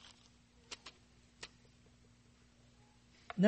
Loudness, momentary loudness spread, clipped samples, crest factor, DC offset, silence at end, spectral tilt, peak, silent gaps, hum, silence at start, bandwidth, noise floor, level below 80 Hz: -57 LUFS; 15 LU; under 0.1%; 26 dB; under 0.1%; 0 s; -6.5 dB/octave; -16 dBFS; none; 60 Hz at -70 dBFS; 0.7 s; 8.4 kHz; -66 dBFS; -72 dBFS